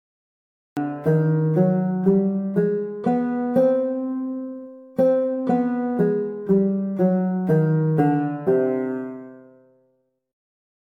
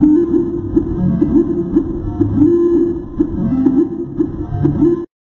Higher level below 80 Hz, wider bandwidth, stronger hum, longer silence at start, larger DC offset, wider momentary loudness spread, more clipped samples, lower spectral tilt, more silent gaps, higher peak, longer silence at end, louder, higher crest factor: second, -62 dBFS vs -30 dBFS; first, 4 kHz vs 3.3 kHz; neither; first, 0.75 s vs 0 s; neither; about the same, 10 LU vs 8 LU; neither; about the same, -11 dB/octave vs -11.5 dB/octave; neither; second, -6 dBFS vs 0 dBFS; first, 1.55 s vs 0.25 s; second, -22 LUFS vs -15 LUFS; about the same, 16 dB vs 14 dB